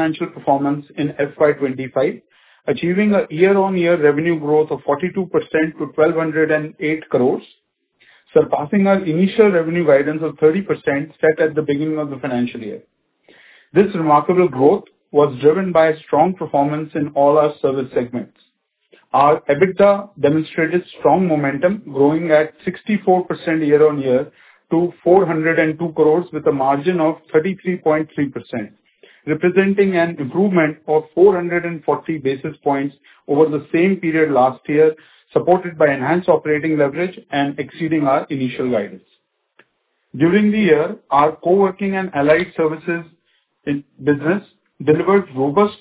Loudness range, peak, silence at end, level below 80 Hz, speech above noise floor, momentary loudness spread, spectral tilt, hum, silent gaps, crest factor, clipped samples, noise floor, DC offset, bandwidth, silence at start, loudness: 3 LU; 0 dBFS; 0.05 s; -58 dBFS; 50 dB; 9 LU; -11 dB/octave; none; none; 16 dB; under 0.1%; -67 dBFS; under 0.1%; 4 kHz; 0 s; -17 LUFS